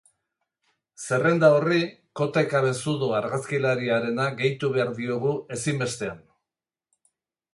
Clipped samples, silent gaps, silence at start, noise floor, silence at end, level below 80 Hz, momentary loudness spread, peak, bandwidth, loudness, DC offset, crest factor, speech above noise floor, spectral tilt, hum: under 0.1%; none; 1 s; under -90 dBFS; 1.35 s; -66 dBFS; 10 LU; -6 dBFS; 11.5 kHz; -24 LUFS; under 0.1%; 20 dB; over 66 dB; -5.5 dB/octave; none